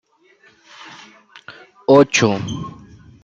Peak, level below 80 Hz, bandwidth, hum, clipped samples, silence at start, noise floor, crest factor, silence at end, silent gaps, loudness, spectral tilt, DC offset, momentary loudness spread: -2 dBFS; -54 dBFS; 7.8 kHz; none; under 0.1%; 0.85 s; -54 dBFS; 18 dB; 0.55 s; none; -16 LUFS; -5 dB/octave; under 0.1%; 27 LU